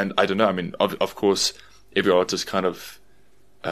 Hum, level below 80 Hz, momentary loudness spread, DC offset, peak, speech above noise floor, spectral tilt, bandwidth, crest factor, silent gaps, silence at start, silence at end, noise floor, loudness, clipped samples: none; -58 dBFS; 9 LU; 0.2%; -2 dBFS; 38 dB; -3.5 dB/octave; 13.5 kHz; 22 dB; none; 0 s; 0 s; -60 dBFS; -22 LUFS; under 0.1%